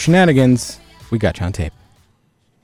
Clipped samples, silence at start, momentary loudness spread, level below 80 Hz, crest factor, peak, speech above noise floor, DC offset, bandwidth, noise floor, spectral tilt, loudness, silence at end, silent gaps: under 0.1%; 0 s; 16 LU; -36 dBFS; 14 dB; -4 dBFS; 46 dB; under 0.1%; 14.5 kHz; -60 dBFS; -6 dB/octave; -16 LUFS; 0.95 s; none